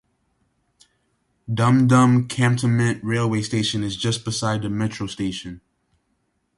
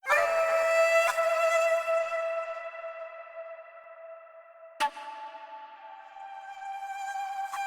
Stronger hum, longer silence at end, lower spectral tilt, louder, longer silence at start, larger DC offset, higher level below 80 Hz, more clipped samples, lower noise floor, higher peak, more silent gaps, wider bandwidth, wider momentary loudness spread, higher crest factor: neither; first, 1 s vs 0 s; first, -5.5 dB/octave vs 0.5 dB/octave; first, -21 LUFS vs -28 LUFS; first, 1.5 s vs 0.05 s; neither; first, -52 dBFS vs -76 dBFS; neither; first, -70 dBFS vs -51 dBFS; first, -6 dBFS vs -14 dBFS; neither; second, 11.5 kHz vs 19 kHz; second, 12 LU vs 23 LU; about the same, 16 dB vs 18 dB